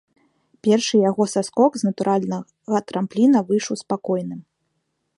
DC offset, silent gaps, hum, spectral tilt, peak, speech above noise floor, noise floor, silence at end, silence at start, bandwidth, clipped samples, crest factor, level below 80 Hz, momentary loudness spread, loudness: under 0.1%; none; none; -5.5 dB/octave; -4 dBFS; 53 dB; -73 dBFS; 0.75 s; 0.65 s; 11.5 kHz; under 0.1%; 18 dB; -70 dBFS; 9 LU; -21 LUFS